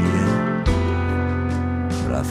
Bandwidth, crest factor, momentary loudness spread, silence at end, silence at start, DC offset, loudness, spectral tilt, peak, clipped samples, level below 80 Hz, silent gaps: 11.5 kHz; 14 dB; 4 LU; 0 s; 0 s; under 0.1%; -22 LUFS; -7 dB/octave; -6 dBFS; under 0.1%; -30 dBFS; none